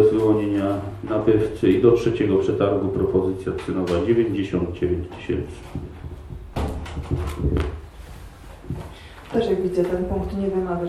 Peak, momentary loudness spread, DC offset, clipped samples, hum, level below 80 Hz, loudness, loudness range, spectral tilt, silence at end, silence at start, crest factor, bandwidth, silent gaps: -2 dBFS; 18 LU; under 0.1%; under 0.1%; none; -38 dBFS; -22 LUFS; 10 LU; -8 dB/octave; 0 s; 0 s; 20 dB; 13 kHz; none